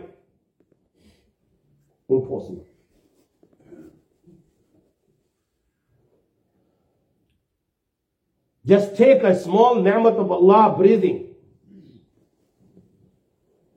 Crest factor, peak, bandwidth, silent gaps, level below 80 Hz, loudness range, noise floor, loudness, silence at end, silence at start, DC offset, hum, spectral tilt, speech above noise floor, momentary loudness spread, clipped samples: 20 dB; -2 dBFS; 8.8 kHz; none; -68 dBFS; 15 LU; -78 dBFS; -17 LUFS; 2.5 s; 2.1 s; under 0.1%; none; -8 dB/octave; 62 dB; 19 LU; under 0.1%